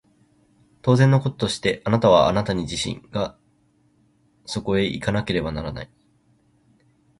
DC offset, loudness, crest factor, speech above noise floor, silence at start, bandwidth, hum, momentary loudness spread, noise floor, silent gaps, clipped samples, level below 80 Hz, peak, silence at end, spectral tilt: under 0.1%; -22 LUFS; 20 dB; 41 dB; 0.85 s; 11.5 kHz; none; 14 LU; -62 dBFS; none; under 0.1%; -46 dBFS; -4 dBFS; 1.35 s; -6 dB/octave